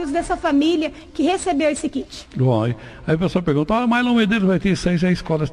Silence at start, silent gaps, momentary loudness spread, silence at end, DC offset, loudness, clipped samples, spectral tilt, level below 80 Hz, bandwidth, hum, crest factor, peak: 0 s; none; 8 LU; 0 s; under 0.1%; -19 LUFS; under 0.1%; -6 dB/octave; -42 dBFS; 11.5 kHz; none; 12 dB; -6 dBFS